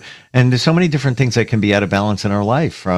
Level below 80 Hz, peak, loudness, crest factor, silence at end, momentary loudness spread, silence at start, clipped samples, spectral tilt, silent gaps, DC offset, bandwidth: -46 dBFS; 0 dBFS; -16 LUFS; 14 dB; 0 s; 4 LU; 0.05 s; under 0.1%; -6.5 dB/octave; none; under 0.1%; 11.5 kHz